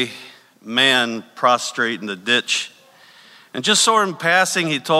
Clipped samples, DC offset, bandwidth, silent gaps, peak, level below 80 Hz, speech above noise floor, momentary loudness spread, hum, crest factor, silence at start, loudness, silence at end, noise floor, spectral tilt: under 0.1%; under 0.1%; 16 kHz; none; -2 dBFS; -72 dBFS; 30 dB; 11 LU; none; 18 dB; 0 s; -17 LUFS; 0 s; -48 dBFS; -2 dB/octave